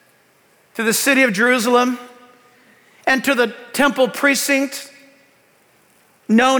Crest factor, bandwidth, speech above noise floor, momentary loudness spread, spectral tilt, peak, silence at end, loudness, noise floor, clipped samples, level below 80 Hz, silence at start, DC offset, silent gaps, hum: 16 dB; over 20 kHz; 39 dB; 16 LU; -3 dB/octave; -4 dBFS; 0 s; -16 LUFS; -56 dBFS; under 0.1%; -64 dBFS; 0.75 s; under 0.1%; none; none